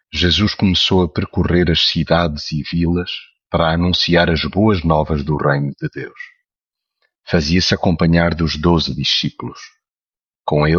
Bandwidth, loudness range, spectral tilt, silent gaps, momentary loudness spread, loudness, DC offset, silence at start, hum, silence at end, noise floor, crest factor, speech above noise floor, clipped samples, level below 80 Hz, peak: 7.2 kHz; 3 LU; -6 dB/octave; 9.92-9.96 s; 13 LU; -16 LUFS; under 0.1%; 0.15 s; none; 0 s; under -90 dBFS; 16 dB; over 74 dB; under 0.1%; -32 dBFS; -2 dBFS